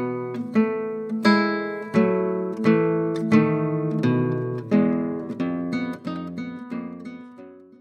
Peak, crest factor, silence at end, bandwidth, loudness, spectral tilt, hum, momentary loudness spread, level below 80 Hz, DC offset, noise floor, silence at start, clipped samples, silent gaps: -4 dBFS; 18 dB; 0.2 s; 9 kHz; -23 LUFS; -8 dB/octave; none; 14 LU; -68 dBFS; under 0.1%; -44 dBFS; 0 s; under 0.1%; none